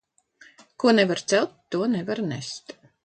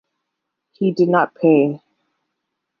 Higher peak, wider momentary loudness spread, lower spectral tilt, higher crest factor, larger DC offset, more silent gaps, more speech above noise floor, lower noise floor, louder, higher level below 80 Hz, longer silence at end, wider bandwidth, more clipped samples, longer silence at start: second, -6 dBFS vs -2 dBFS; first, 14 LU vs 8 LU; second, -4.5 dB/octave vs -9 dB/octave; about the same, 20 dB vs 18 dB; neither; neither; second, 32 dB vs 63 dB; second, -55 dBFS vs -78 dBFS; second, -24 LUFS vs -17 LUFS; about the same, -70 dBFS vs -72 dBFS; second, 0.35 s vs 1.05 s; first, 9.2 kHz vs 6.6 kHz; neither; about the same, 0.8 s vs 0.8 s